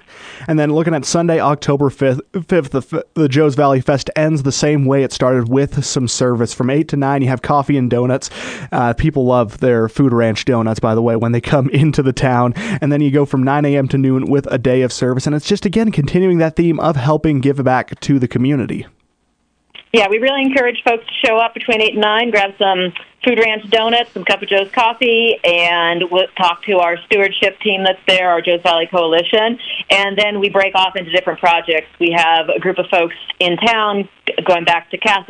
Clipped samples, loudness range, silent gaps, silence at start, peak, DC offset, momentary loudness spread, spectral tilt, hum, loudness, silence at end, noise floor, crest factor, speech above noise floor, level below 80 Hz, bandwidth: under 0.1%; 3 LU; none; 0.15 s; 0 dBFS; under 0.1%; 5 LU; -5.5 dB/octave; none; -14 LUFS; 0.05 s; -63 dBFS; 14 dB; 49 dB; -42 dBFS; 10 kHz